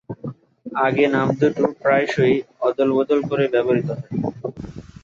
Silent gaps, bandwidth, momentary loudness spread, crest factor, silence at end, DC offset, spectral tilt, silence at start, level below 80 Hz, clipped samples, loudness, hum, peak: none; 7.4 kHz; 15 LU; 16 dB; 0.2 s; under 0.1%; -7.5 dB/octave; 0.1 s; -54 dBFS; under 0.1%; -20 LUFS; none; -4 dBFS